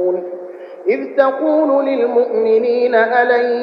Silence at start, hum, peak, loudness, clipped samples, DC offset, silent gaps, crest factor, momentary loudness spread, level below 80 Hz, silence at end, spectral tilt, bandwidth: 0 s; none; 0 dBFS; -15 LUFS; under 0.1%; under 0.1%; none; 14 dB; 10 LU; -70 dBFS; 0 s; -7 dB/octave; 5.4 kHz